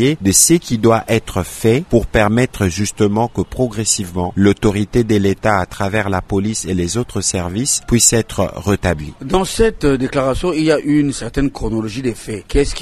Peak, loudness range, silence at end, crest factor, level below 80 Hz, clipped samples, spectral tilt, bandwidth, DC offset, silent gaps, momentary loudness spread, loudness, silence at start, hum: 0 dBFS; 2 LU; 0 s; 16 dB; -30 dBFS; under 0.1%; -4.5 dB/octave; 13.5 kHz; under 0.1%; none; 8 LU; -16 LUFS; 0 s; none